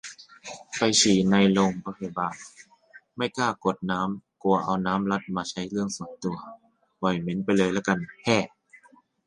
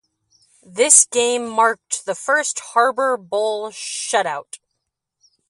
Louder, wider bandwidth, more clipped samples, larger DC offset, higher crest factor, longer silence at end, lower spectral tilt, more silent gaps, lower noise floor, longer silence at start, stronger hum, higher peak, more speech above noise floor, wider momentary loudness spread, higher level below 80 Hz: second, -25 LUFS vs -17 LUFS; second, 11 kHz vs 13 kHz; neither; neither; about the same, 20 dB vs 20 dB; second, 0.8 s vs 0.95 s; first, -4.5 dB/octave vs 0 dB/octave; neither; second, -58 dBFS vs -78 dBFS; second, 0.05 s vs 0.7 s; neither; second, -6 dBFS vs 0 dBFS; second, 33 dB vs 59 dB; first, 19 LU vs 15 LU; first, -60 dBFS vs -72 dBFS